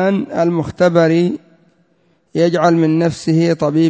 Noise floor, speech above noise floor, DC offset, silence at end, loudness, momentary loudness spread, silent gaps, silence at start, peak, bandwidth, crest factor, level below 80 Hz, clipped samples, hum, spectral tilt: -58 dBFS; 45 dB; under 0.1%; 0 s; -15 LUFS; 5 LU; none; 0 s; 0 dBFS; 8 kHz; 14 dB; -52 dBFS; under 0.1%; none; -7.5 dB/octave